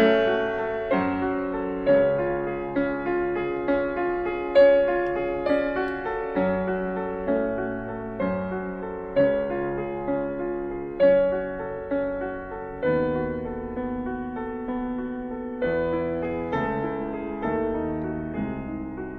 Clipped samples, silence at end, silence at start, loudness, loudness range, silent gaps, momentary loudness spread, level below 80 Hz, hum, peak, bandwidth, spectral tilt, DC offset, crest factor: under 0.1%; 0 s; 0 s; -26 LUFS; 6 LU; none; 11 LU; -46 dBFS; none; -8 dBFS; 5.2 kHz; -9 dB/octave; under 0.1%; 18 dB